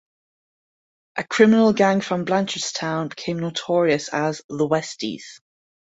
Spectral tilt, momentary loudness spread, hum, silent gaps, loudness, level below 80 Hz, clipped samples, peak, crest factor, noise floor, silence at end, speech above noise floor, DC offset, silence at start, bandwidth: -5 dB/octave; 14 LU; none; 4.44-4.49 s; -21 LUFS; -64 dBFS; under 0.1%; -2 dBFS; 20 dB; under -90 dBFS; 0.45 s; over 69 dB; under 0.1%; 1.15 s; 8 kHz